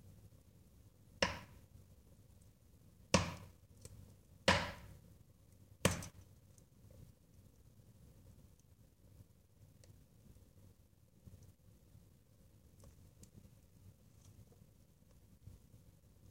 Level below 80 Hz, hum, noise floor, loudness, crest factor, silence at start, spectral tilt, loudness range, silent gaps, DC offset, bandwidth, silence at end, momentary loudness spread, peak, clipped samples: -64 dBFS; none; -68 dBFS; -38 LUFS; 34 dB; 0.05 s; -3.5 dB/octave; 24 LU; none; under 0.1%; 16 kHz; 0.8 s; 29 LU; -14 dBFS; under 0.1%